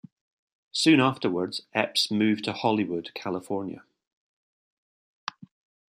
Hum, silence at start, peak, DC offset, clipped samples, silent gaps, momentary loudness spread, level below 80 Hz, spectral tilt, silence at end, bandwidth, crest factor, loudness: none; 0.75 s; -6 dBFS; under 0.1%; under 0.1%; 4.07-5.27 s; 18 LU; -72 dBFS; -4.5 dB/octave; 0.45 s; 14.5 kHz; 22 dB; -26 LUFS